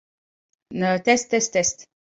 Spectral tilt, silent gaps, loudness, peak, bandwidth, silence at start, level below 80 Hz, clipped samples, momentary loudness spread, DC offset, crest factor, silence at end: -3 dB/octave; none; -21 LUFS; -4 dBFS; 8.4 kHz; 0.7 s; -62 dBFS; under 0.1%; 13 LU; under 0.1%; 20 dB; 0.35 s